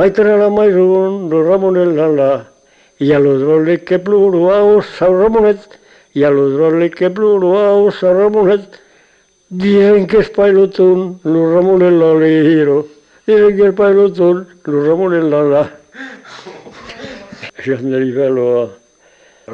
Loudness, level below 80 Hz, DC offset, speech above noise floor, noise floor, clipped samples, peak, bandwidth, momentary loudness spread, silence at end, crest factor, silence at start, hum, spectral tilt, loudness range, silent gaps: -11 LUFS; -48 dBFS; under 0.1%; 42 dB; -52 dBFS; under 0.1%; -2 dBFS; 6.6 kHz; 15 LU; 0 s; 10 dB; 0 s; none; -8.5 dB/octave; 7 LU; none